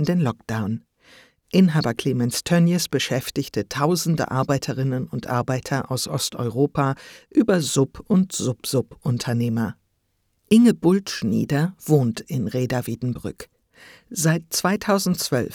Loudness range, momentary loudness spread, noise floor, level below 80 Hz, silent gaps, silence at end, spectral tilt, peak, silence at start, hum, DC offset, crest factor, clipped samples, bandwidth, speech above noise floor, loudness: 3 LU; 8 LU; -70 dBFS; -54 dBFS; none; 0 s; -5.5 dB/octave; -4 dBFS; 0 s; none; under 0.1%; 18 dB; under 0.1%; 19 kHz; 48 dB; -22 LUFS